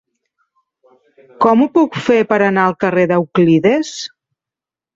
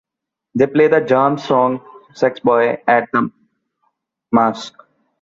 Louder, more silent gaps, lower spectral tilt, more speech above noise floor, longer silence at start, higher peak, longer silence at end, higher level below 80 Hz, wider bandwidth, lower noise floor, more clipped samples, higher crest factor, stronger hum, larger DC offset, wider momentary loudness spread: about the same, -14 LUFS vs -16 LUFS; neither; about the same, -6.5 dB/octave vs -6.5 dB/octave; first, 75 dB vs 67 dB; first, 1.4 s vs 0.55 s; about the same, 0 dBFS vs 0 dBFS; first, 0.9 s vs 0.55 s; about the same, -58 dBFS vs -60 dBFS; about the same, 7.8 kHz vs 7.6 kHz; first, -88 dBFS vs -82 dBFS; neither; about the same, 14 dB vs 16 dB; neither; neither; second, 7 LU vs 13 LU